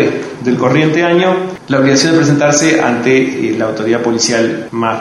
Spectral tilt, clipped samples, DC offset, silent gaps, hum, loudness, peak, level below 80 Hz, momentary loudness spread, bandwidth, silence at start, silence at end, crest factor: -4.5 dB/octave; under 0.1%; under 0.1%; none; none; -12 LUFS; 0 dBFS; -52 dBFS; 7 LU; 12 kHz; 0 s; 0 s; 12 dB